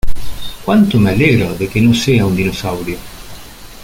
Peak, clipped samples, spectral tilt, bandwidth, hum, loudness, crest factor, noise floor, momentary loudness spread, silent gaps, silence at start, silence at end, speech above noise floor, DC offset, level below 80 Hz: 0 dBFS; under 0.1%; -6 dB/octave; 17 kHz; none; -13 LUFS; 12 dB; -32 dBFS; 20 LU; none; 0.05 s; 0 s; 20 dB; under 0.1%; -28 dBFS